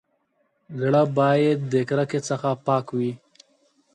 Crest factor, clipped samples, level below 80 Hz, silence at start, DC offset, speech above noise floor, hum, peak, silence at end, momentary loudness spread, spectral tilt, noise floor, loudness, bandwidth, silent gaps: 16 dB; under 0.1%; -70 dBFS; 0.7 s; under 0.1%; 48 dB; none; -6 dBFS; 0.8 s; 9 LU; -7 dB/octave; -69 dBFS; -23 LUFS; 9.8 kHz; none